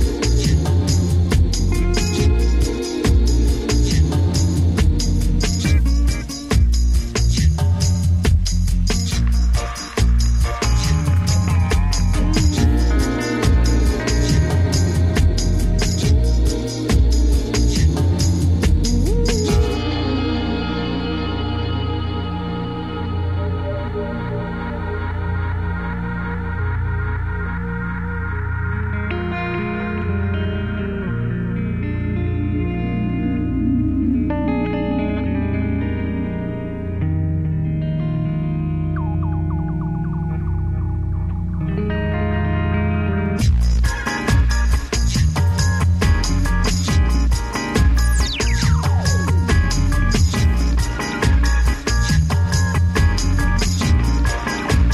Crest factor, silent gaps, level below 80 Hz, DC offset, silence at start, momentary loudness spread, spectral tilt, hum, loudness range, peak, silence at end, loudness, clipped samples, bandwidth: 14 dB; none; -20 dBFS; 0.3%; 0 s; 7 LU; -5.5 dB/octave; none; 6 LU; -4 dBFS; 0 s; -19 LUFS; under 0.1%; 13.5 kHz